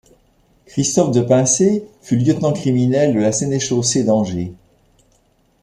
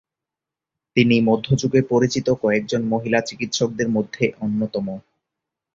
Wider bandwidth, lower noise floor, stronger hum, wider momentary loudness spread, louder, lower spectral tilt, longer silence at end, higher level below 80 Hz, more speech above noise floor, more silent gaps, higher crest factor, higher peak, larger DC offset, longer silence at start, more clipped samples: first, 12.5 kHz vs 7.6 kHz; second, -58 dBFS vs -87 dBFS; neither; about the same, 9 LU vs 7 LU; first, -16 LUFS vs -20 LUFS; about the same, -5.5 dB/octave vs -5.5 dB/octave; first, 1.1 s vs 0.75 s; about the same, -52 dBFS vs -54 dBFS; second, 42 dB vs 67 dB; neither; about the same, 16 dB vs 18 dB; about the same, -2 dBFS vs -2 dBFS; neither; second, 0.75 s vs 0.95 s; neither